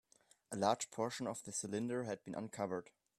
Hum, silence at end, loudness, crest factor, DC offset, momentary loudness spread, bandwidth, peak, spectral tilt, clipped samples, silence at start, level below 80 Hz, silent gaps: none; 0.35 s; -41 LUFS; 24 dB; under 0.1%; 9 LU; 13.5 kHz; -18 dBFS; -4 dB/octave; under 0.1%; 0.5 s; -80 dBFS; none